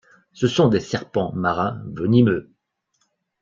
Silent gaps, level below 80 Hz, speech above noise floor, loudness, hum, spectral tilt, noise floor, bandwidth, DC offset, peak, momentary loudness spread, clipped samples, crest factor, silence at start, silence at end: none; -54 dBFS; 51 dB; -21 LUFS; none; -7 dB/octave; -71 dBFS; 7.4 kHz; under 0.1%; -2 dBFS; 9 LU; under 0.1%; 18 dB; 0.35 s; 1 s